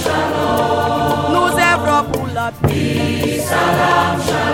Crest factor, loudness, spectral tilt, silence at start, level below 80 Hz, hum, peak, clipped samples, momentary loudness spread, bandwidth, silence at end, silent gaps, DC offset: 14 dB; -15 LUFS; -5 dB/octave; 0 s; -40 dBFS; none; -2 dBFS; under 0.1%; 5 LU; 17 kHz; 0 s; none; under 0.1%